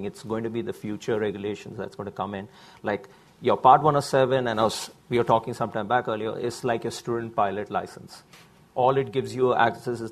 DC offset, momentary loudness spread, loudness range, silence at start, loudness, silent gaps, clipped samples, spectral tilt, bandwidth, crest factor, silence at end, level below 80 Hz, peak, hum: under 0.1%; 14 LU; 6 LU; 0 s; -25 LUFS; none; under 0.1%; -5.5 dB/octave; 14 kHz; 22 dB; 0 s; -60 dBFS; -4 dBFS; none